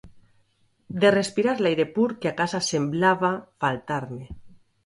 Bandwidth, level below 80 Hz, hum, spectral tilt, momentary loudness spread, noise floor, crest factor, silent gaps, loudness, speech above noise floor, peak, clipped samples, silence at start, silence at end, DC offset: 11.5 kHz; -56 dBFS; none; -5 dB/octave; 13 LU; -65 dBFS; 20 dB; none; -24 LUFS; 41 dB; -6 dBFS; under 0.1%; 0.05 s; 0.3 s; under 0.1%